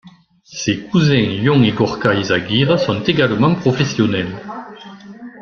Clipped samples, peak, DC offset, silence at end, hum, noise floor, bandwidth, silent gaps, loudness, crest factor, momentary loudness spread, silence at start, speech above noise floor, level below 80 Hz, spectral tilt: under 0.1%; 0 dBFS; under 0.1%; 0 s; none; -45 dBFS; 7.2 kHz; none; -16 LUFS; 16 dB; 19 LU; 0.05 s; 30 dB; -48 dBFS; -6 dB/octave